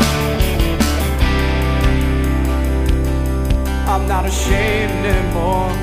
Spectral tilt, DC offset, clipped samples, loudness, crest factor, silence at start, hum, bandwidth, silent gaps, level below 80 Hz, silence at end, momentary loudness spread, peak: -5.5 dB/octave; under 0.1%; under 0.1%; -17 LUFS; 14 dB; 0 s; none; 15.5 kHz; none; -18 dBFS; 0 s; 2 LU; 0 dBFS